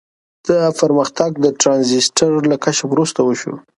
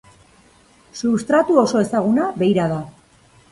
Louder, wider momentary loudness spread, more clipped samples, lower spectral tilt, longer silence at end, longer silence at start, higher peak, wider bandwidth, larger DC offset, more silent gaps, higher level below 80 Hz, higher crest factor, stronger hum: first, -15 LUFS vs -18 LUFS; second, 5 LU vs 12 LU; neither; second, -4 dB/octave vs -6.5 dB/octave; second, 0.2 s vs 0.6 s; second, 0.45 s vs 0.95 s; about the same, 0 dBFS vs -2 dBFS; about the same, 11.5 kHz vs 11.5 kHz; neither; neither; about the same, -58 dBFS vs -56 dBFS; about the same, 16 dB vs 16 dB; neither